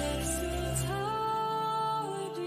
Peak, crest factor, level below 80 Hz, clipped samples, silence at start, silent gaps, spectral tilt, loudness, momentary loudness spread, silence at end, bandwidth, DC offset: -20 dBFS; 14 dB; -44 dBFS; under 0.1%; 0 s; none; -4.5 dB/octave; -32 LUFS; 2 LU; 0 s; 15.5 kHz; under 0.1%